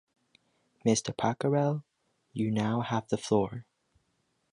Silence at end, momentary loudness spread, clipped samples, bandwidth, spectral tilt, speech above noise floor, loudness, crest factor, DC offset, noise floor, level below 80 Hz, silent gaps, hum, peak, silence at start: 0.9 s; 9 LU; under 0.1%; 11.5 kHz; -5.5 dB/octave; 47 dB; -30 LUFS; 20 dB; under 0.1%; -76 dBFS; -64 dBFS; none; none; -12 dBFS; 0.85 s